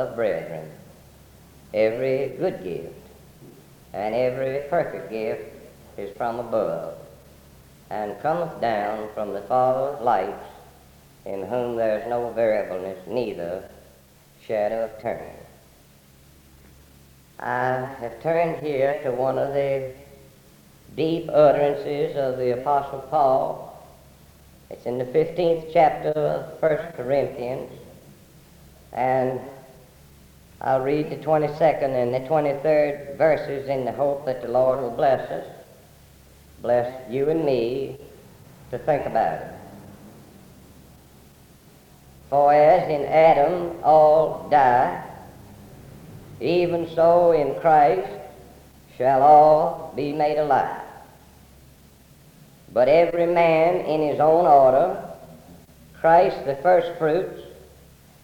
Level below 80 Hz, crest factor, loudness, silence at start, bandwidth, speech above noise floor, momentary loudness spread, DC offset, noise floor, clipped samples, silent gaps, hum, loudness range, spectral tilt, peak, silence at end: -56 dBFS; 20 dB; -22 LUFS; 0 s; 20 kHz; 32 dB; 18 LU; under 0.1%; -53 dBFS; under 0.1%; none; none; 11 LU; -7 dB/octave; -4 dBFS; 0.7 s